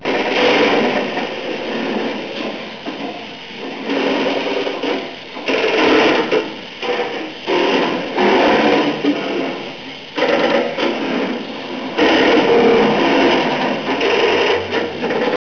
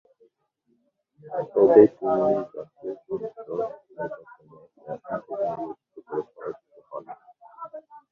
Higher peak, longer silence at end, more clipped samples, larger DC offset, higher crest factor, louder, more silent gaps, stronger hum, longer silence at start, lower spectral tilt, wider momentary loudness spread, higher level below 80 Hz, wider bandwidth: second, -6 dBFS vs -2 dBFS; about the same, 0.05 s vs 0.15 s; neither; first, 0.4% vs under 0.1%; second, 10 dB vs 24 dB; first, -16 LUFS vs -24 LUFS; neither; neither; second, 0 s vs 1.25 s; second, -4.5 dB/octave vs -10 dB/octave; second, 14 LU vs 25 LU; first, -52 dBFS vs -68 dBFS; first, 5.4 kHz vs 3.8 kHz